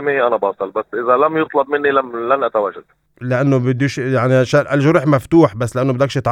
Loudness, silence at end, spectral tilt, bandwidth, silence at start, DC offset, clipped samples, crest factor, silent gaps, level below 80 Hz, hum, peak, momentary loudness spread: -16 LUFS; 0 s; -7 dB/octave; 12.5 kHz; 0 s; under 0.1%; under 0.1%; 16 dB; none; -52 dBFS; none; 0 dBFS; 7 LU